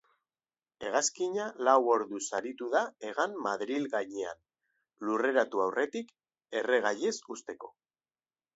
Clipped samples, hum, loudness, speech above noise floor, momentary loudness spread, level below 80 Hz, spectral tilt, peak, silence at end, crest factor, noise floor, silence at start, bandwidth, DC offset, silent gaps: under 0.1%; none; -31 LUFS; over 59 dB; 15 LU; -80 dBFS; -2.5 dB/octave; -10 dBFS; 0.85 s; 22 dB; under -90 dBFS; 0.8 s; 8 kHz; under 0.1%; none